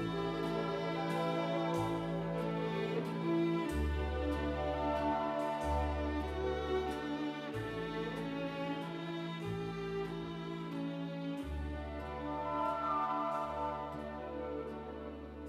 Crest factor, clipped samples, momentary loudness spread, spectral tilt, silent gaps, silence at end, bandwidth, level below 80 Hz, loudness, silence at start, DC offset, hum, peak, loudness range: 14 dB; under 0.1%; 7 LU; -7 dB/octave; none; 0 s; 14.5 kHz; -48 dBFS; -38 LUFS; 0 s; under 0.1%; none; -24 dBFS; 5 LU